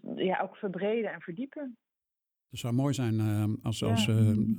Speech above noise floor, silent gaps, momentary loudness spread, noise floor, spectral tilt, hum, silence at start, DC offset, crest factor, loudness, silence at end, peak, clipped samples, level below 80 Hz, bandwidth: 60 dB; none; 14 LU; -90 dBFS; -6.5 dB/octave; none; 0.05 s; under 0.1%; 16 dB; -30 LUFS; 0 s; -16 dBFS; under 0.1%; -62 dBFS; 15.5 kHz